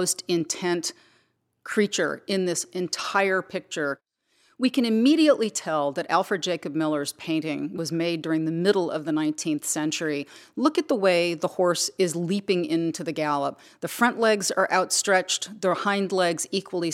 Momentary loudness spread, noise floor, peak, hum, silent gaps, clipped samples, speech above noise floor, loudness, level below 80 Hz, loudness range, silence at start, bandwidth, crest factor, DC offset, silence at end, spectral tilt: 8 LU; -68 dBFS; -6 dBFS; none; none; under 0.1%; 43 dB; -25 LUFS; -78 dBFS; 3 LU; 0 s; 16.5 kHz; 18 dB; under 0.1%; 0 s; -3.5 dB/octave